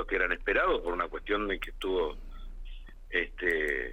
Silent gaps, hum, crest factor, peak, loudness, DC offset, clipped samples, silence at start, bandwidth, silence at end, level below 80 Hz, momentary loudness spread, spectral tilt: none; none; 18 dB; -14 dBFS; -30 LUFS; under 0.1%; under 0.1%; 0 s; 15.5 kHz; 0 s; -42 dBFS; 21 LU; -5 dB/octave